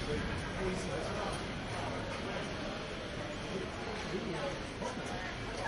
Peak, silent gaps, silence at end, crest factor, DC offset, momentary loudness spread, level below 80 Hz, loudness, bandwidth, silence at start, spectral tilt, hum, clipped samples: -24 dBFS; none; 0 s; 14 dB; under 0.1%; 3 LU; -50 dBFS; -39 LUFS; 11.5 kHz; 0 s; -5 dB/octave; none; under 0.1%